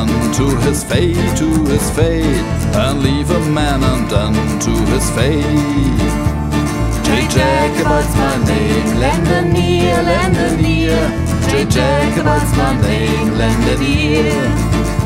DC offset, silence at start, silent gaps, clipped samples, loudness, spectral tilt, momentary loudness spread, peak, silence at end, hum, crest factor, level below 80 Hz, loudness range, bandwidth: under 0.1%; 0 s; none; under 0.1%; -14 LUFS; -5.5 dB/octave; 3 LU; 0 dBFS; 0 s; none; 14 dB; -22 dBFS; 1 LU; 16.5 kHz